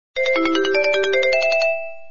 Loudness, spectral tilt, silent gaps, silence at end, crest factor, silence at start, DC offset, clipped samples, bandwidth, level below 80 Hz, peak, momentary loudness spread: -18 LUFS; -2.5 dB/octave; none; 0.1 s; 12 dB; 0.15 s; 2%; under 0.1%; 7.4 kHz; -54 dBFS; -6 dBFS; 4 LU